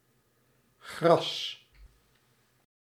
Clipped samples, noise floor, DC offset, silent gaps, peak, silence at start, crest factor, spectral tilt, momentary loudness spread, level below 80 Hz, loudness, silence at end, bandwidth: under 0.1%; -70 dBFS; under 0.1%; none; -8 dBFS; 0.85 s; 24 dB; -5 dB/octave; 23 LU; -66 dBFS; -28 LUFS; 0.95 s; 14.5 kHz